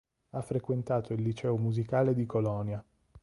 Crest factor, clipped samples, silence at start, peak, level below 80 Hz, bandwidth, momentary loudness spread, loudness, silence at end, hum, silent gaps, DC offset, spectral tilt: 16 dB; under 0.1%; 0.35 s; -16 dBFS; -60 dBFS; 11.5 kHz; 11 LU; -32 LUFS; 0.05 s; none; none; under 0.1%; -9 dB/octave